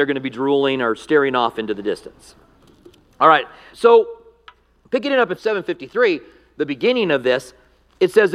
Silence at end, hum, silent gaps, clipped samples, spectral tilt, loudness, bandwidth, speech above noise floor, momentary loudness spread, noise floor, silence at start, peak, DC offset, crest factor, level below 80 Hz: 0 s; none; none; under 0.1%; -5.5 dB/octave; -18 LUFS; 12.5 kHz; 32 dB; 12 LU; -50 dBFS; 0 s; 0 dBFS; under 0.1%; 18 dB; -60 dBFS